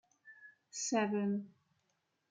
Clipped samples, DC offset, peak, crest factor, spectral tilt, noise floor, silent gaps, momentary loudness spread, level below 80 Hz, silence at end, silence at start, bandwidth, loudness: under 0.1%; under 0.1%; -20 dBFS; 18 dB; -4.5 dB/octave; -82 dBFS; none; 23 LU; under -90 dBFS; 0.85 s; 0.25 s; 9.6 kHz; -37 LUFS